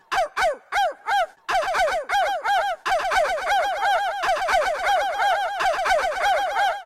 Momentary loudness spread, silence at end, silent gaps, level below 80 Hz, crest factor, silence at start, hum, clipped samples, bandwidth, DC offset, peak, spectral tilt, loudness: 3 LU; 0 s; none; -50 dBFS; 12 dB; 0.1 s; none; under 0.1%; 15 kHz; under 0.1%; -10 dBFS; -0.5 dB/octave; -22 LUFS